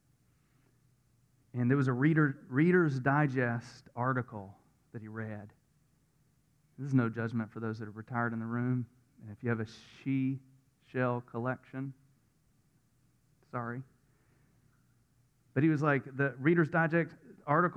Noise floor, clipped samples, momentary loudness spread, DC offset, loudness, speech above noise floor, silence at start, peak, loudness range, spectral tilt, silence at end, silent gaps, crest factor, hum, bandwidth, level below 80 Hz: -71 dBFS; under 0.1%; 17 LU; under 0.1%; -32 LUFS; 39 dB; 1.55 s; -14 dBFS; 12 LU; -9 dB/octave; 0 s; none; 20 dB; none; 8.6 kHz; -74 dBFS